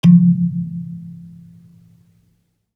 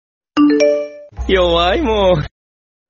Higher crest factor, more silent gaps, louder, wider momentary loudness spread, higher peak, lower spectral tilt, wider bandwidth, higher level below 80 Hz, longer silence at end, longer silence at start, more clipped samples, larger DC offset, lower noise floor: about the same, 16 dB vs 14 dB; neither; about the same, -16 LUFS vs -14 LUFS; first, 27 LU vs 14 LU; about the same, -2 dBFS vs -2 dBFS; first, -9.5 dB/octave vs -4 dB/octave; second, 5.2 kHz vs 7.2 kHz; second, -58 dBFS vs -30 dBFS; first, 1.5 s vs 0.6 s; second, 0.05 s vs 0.35 s; neither; neither; second, -63 dBFS vs under -90 dBFS